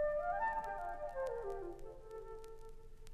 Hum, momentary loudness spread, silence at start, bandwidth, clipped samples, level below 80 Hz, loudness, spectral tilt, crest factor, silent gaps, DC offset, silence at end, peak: none; 19 LU; 0 s; 13.5 kHz; under 0.1%; -54 dBFS; -42 LUFS; -5.5 dB/octave; 14 dB; none; under 0.1%; 0 s; -28 dBFS